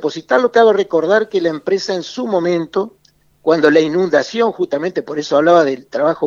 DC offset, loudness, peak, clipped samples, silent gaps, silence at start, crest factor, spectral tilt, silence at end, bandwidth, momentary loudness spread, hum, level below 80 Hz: under 0.1%; -15 LUFS; 0 dBFS; under 0.1%; none; 0 s; 14 dB; -5.5 dB/octave; 0 s; 7.4 kHz; 10 LU; none; -64 dBFS